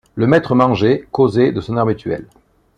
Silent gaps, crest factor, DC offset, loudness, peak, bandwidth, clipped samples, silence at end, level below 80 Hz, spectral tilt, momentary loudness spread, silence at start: none; 14 dB; under 0.1%; -15 LUFS; 0 dBFS; 9.6 kHz; under 0.1%; 0.55 s; -48 dBFS; -8.5 dB/octave; 9 LU; 0.15 s